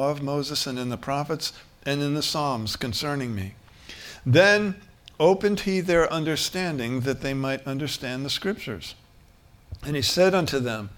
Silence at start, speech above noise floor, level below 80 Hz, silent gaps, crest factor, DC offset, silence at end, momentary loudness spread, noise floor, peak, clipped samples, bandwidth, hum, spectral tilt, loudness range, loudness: 0 s; 29 dB; -50 dBFS; none; 22 dB; under 0.1%; 0 s; 14 LU; -54 dBFS; -4 dBFS; under 0.1%; 18.5 kHz; none; -4.5 dB/octave; 6 LU; -25 LUFS